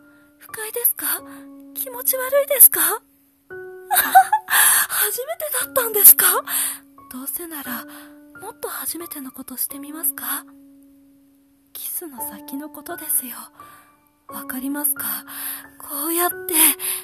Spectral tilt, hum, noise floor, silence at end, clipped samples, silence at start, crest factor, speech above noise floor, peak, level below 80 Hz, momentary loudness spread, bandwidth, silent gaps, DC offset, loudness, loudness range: 0.5 dB/octave; none; -56 dBFS; 0 s; under 0.1%; 0.45 s; 22 dB; 36 dB; 0 dBFS; -66 dBFS; 23 LU; 15.5 kHz; none; under 0.1%; -17 LUFS; 14 LU